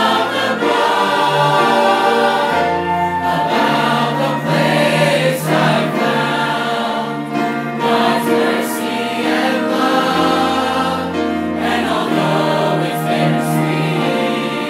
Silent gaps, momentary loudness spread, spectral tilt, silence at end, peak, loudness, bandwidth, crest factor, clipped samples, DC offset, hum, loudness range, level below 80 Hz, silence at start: none; 6 LU; -5 dB/octave; 0 s; 0 dBFS; -15 LUFS; 16 kHz; 14 dB; under 0.1%; under 0.1%; none; 2 LU; -58 dBFS; 0 s